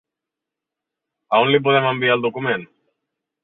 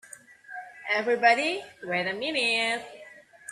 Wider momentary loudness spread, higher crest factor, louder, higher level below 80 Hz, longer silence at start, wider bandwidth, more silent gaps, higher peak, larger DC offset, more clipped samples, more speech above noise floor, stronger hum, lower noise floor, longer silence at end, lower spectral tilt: second, 8 LU vs 21 LU; about the same, 20 dB vs 20 dB; first, -18 LUFS vs -26 LUFS; first, -64 dBFS vs -76 dBFS; first, 1.3 s vs 0.1 s; second, 4.1 kHz vs 13 kHz; neither; first, -2 dBFS vs -8 dBFS; neither; neither; first, 67 dB vs 24 dB; neither; first, -85 dBFS vs -50 dBFS; first, 0.8 s vs 0 s; first, -9 dB/octave vs -2.5 dB/octave